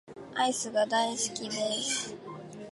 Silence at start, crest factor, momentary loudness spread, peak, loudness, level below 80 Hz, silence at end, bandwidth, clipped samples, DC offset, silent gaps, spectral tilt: 0.05 s; 16 dB; 14 LU; -14 dBFS; -30 LUFS; -72 dBFS; 0 s; 11.5 kHz; under 0.1%; under 0.1%; none; -1.5 dB/octave